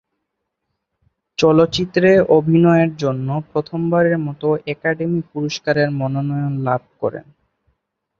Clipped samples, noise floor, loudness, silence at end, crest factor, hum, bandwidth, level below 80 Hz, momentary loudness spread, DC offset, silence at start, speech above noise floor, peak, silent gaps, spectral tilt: under 0.1%; -76 dBFS; -17 LUFS; 1 s; 18 dB; none; 7.6 kHz; -54 dBFS; 10 LU; under 0.1%; 1.4 s; 60 dB; 0 dBFS; none; -7 dB/octave